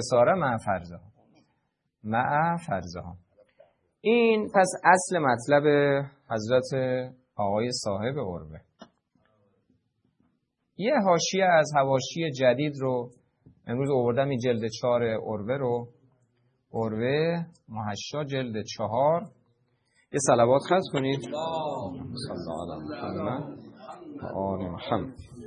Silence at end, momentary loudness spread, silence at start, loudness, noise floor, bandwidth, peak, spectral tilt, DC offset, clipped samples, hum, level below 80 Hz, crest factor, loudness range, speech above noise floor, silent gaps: 0 s; 15 LU; 0 s; -26 LUFS; -76 dBFS; 11 kHz; -4 dBFS; -5 dB/octave; under 0.1%; under 0.1%; none; -64 dBFS; 24 dB; 10 LU; 50 dB; none